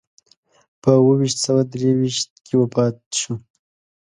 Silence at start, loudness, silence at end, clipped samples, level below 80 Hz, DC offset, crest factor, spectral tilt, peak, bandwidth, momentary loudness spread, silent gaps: 0.85 s; -19 LUFS; 0.65 s; under 0.1%; -62 dBFS; under 0.1%; 20 dB; -5.5 dB/octave; 0 dBFS; 11 kHz; 9 LU; 2.30-2.36 s, 3.06-3.11 s